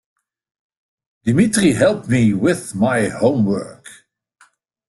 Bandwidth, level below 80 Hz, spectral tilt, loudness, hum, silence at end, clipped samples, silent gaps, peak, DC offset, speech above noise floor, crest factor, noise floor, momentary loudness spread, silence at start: 12.5 kHz; -50 dBFS; -6 dB/octave; -17 LUFS; none; 0.95 s; under 0.1%; none; -2 dBFS; under 0.1%; 40 dB; 16 dB; -56 dBFS; 7 LU; 1.25 s